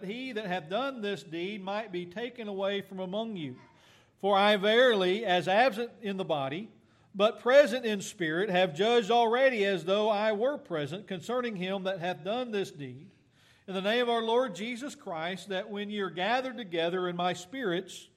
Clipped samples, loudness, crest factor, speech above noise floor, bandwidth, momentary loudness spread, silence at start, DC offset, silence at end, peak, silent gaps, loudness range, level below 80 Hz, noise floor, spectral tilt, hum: under 0.1%; -29 LUFS; 20 dB; 34 dB; 14 kHz; 13 LU; 0 s; under 0.1%; 0.15 s; -10 dBFS; none; 8 LU; -80 dBFS; -63 dBFS; -4.5 dB/octave; none